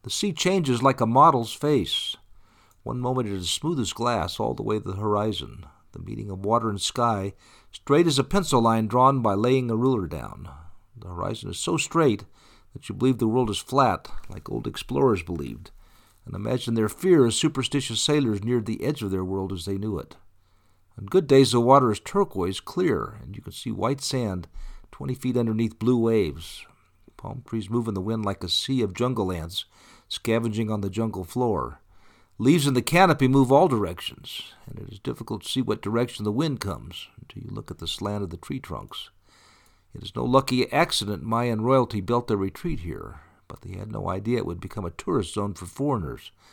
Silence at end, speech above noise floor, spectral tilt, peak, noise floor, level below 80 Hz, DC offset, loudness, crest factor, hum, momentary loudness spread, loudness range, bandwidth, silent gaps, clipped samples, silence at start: 0.25 s; 35 dB; -5.5 dB/octave; -4 dBFS; -60 dBFS; -48 dBFS; under 0.1%; -24 LUFS; 22 dB; none; 19 LU; 7 LU; 19 kHz; none; under 0.1%; 0.05 s